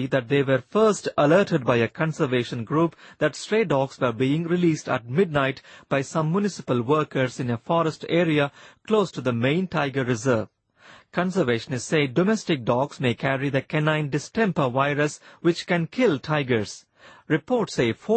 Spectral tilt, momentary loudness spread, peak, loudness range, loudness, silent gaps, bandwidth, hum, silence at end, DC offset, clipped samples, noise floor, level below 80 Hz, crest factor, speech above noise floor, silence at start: -6 dB/octave; 5 LU; -6 dBFS; 2 LU; -24 LUFS; none; 8.8 kHz; none; 0 s; under 0.1%; under 0.1%; -52 dBFS; -60 dBFS; 18 dB; 29 dB; 0 s